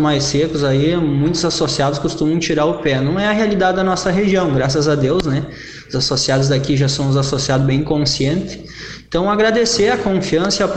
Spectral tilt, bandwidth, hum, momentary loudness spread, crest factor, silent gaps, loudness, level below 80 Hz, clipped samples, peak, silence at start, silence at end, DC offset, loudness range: -5 dB/octave; 9 kHz; none; 6 LU; 16 dB; none; -16 LUFS; -38 dBFS; under 0.1%; 0 dBFS; 0 s; 0 s; under 0.1%; 1 LU